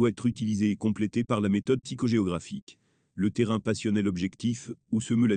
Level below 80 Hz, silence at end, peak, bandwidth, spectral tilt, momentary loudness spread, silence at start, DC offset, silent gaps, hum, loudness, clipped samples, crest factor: -64 dBFS; 0 s; -12 dBFS; 9.6 kHz; -6.5 dB/octave; 7 LU; 0 s; under 0.1%; 2.62-2.67 s; none; -28 LUFS; under 0.1%; 16 dB